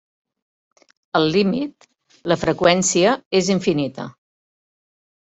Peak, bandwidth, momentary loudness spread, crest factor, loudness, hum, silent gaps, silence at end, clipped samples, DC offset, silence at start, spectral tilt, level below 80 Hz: -2 dBFS; 8.2 kHz; 15 LU; 20 dB; -19 LUFS; none; 3.26-3.31 s; 1.15 s; under 0.1%; under 0.1%; 1.15 s; -4 dB/octave; -56 dBFS